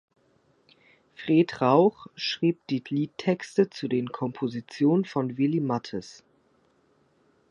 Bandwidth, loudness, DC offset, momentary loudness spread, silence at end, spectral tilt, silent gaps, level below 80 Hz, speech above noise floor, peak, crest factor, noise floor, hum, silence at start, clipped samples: 10.5 kHz; -26 LUFS; under 0.1%; 11 LU; 1.4 s; -7 dB/octave; none; -72 dBFS; 40 dB; -8 dBFS; 20 dB; -65 dBFS; none; 1.2 s; under 0.1%